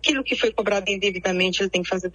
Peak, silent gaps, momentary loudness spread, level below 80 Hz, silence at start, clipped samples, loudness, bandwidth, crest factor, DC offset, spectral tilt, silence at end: -4 dBFS; none; 2 LU; -52 dBFS; 0 s; under 0.1%; -22 LUFS; 10.5 kHz; 18 dB; under 0.1%; -3.5 dB/octave; 0.05 s